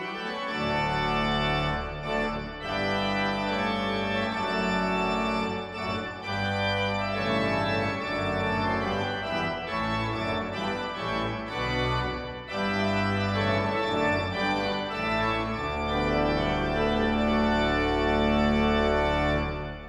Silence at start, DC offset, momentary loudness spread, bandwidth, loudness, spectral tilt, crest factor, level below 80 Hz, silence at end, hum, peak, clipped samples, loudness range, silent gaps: 0 s; under 0.1%; 7 LU; 12 kHz; -27 LUFS; -6 dB/octave; 16 dB; -40 dBFS; 0 s; none; -12 dBFS; under 0.1%; 4 LU; none